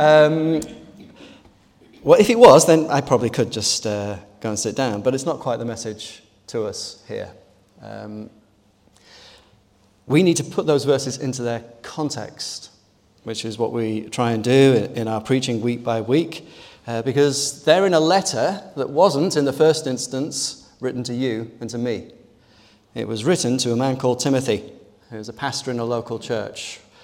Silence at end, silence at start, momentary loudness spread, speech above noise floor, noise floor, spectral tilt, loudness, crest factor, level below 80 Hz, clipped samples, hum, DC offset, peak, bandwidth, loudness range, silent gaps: 0.25 s; 0 s; 17 LU; 38 dB; -57 dBFS; -4.5 dB/octave; -20 LUFS; 20 dB; -60 dBFS; under 0.1%; none; under 0.1%; 0 dBFS; 17 kHz; 11 LU; none